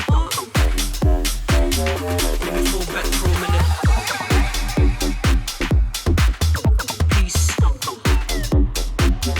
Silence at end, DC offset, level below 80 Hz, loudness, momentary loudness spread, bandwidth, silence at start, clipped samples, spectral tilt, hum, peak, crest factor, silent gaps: 0 s; under 0.1%; -20 dBFS; -20 LUFS; 3 LU; over 20 kHz; 0 s; under 0.1%; -4.5 dB/octave; none; -6 dBFS; 12 dB; none